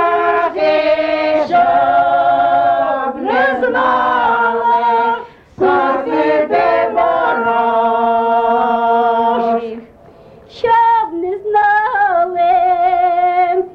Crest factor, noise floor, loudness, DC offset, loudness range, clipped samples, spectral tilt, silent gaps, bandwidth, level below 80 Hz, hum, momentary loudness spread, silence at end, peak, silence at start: 10 dB; -41 dBFS; -13 LUFS; under 0.1%; 2 LU; under 0.1%; -6 dB/octave; none; 6 kHz; -52 dBFS; none; 4 LU; 0 s; -4 dBFS; 0 s